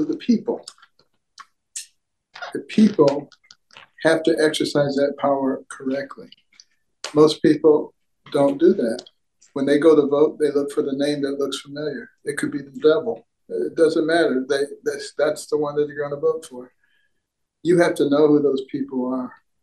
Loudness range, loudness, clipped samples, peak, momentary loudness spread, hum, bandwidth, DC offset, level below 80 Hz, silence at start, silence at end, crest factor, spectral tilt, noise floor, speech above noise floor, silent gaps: 4 LU; -20 LUFS; under 0.1%; -2 dBFS; 16 LU; none; 12.5 kHz; under 0.1%; -68 dBFS; 0 s; 0.3 s; 20 dB; -5.5 dB/octave; -76 dBFS; 57 dB; none